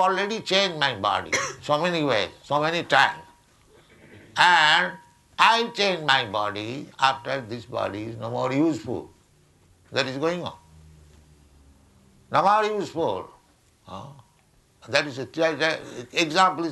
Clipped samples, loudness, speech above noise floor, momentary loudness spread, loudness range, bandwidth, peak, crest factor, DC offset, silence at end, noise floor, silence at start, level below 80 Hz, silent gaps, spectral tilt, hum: under 0.1%; -23 LUFS; 37 dB; 14 LU; 8 LU; 12 kHz; -2 dBFS; 24 dB; under 0.1%; 0 s; -61 dBFS; 0 s; -62 dBFS; none; -3.5 dB/octave; none